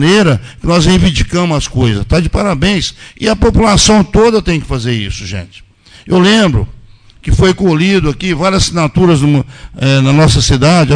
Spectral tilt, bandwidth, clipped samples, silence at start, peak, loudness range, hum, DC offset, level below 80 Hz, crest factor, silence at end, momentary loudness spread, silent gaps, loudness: -5 dB/octave; 10 kHz; under 0.1%; 0 s; 0 dBFS; 2 LU; none; under 0.1%; -22 dBFS; 10 dB; 0 s; 9 LU; none; -10 LUFS